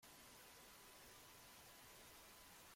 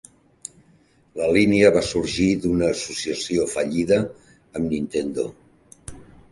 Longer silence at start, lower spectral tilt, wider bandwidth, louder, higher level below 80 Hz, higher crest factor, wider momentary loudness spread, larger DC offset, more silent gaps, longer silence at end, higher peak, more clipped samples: second, 0 s vs 1.15 s; second, -1.5 dB/octave vs -5 dB/octave; first, 16.5 kHz vs 11.5 kHz; second, -61 LUFS vs -21 LUFS; second, -80 dBFS vs -46 dBFS; second, 12 dB vs 20 dB; second, 1 LU vs 23 LU; neither; neither; second, 0 s vs 0.3 s; second, -52 dBFS vs -2 dBFS; neither